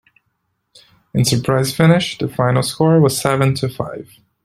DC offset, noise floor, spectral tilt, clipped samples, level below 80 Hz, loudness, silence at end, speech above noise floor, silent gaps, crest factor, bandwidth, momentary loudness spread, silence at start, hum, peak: under 0.1%; -70 dBFS; -5.5 dB/octave; under 0.1%; -48 dBFS; -16 LUFS; 0.4 s; 54 dB; none; 16 dB; 14.5 kHz; 11 LU; 1.15 s; none; 0 dBFS